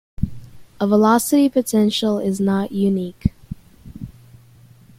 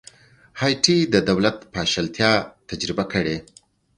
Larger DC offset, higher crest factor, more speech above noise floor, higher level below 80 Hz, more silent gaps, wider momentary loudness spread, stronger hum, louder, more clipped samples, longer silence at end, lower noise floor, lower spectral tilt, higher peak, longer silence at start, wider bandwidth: neither; about the same, 18 dB vs 22 dB; about the same, 30 dB vs 28 dB; first, -42 dBFS vs -50 dBFS; neither; first, 22 LU vs 11 LU; neither; about the same, -19 LUFS vs -21 LUFS; neither; first, 0.9 s vs 0.55 s; about the same, -48 dBFS vs -49 dBFS; first, -5.5 dB/octave vs -4 dB/octave; about the same, -2 dBFS vs 0 dBFS; second, 0.2 s vs 0.55 s; first, 16 kHz vs 11 kHz